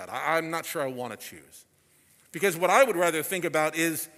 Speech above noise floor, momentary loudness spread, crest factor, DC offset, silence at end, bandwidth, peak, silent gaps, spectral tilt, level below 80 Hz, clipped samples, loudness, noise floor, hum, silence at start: 35 dB; 16 LU; 22 dB; under 0.1%; 0.1 s; 16 kHz; -4 dBFS; none; -3.5 dB/octave; -76 dBFS; under 0.1%; -26 LUFS; -62 dBFS; none; 0 s